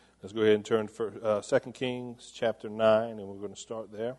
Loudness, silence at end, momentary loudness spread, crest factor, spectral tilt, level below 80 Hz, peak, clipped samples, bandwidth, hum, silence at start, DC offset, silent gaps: -30 LUFS; 0.05 s; 15 LU; 18 dB; -5 dB/octave; -70 dBFS; -12 dBFS; under 0.1%; 11.5 kHz; none; 0.25 s; under 0.1%; none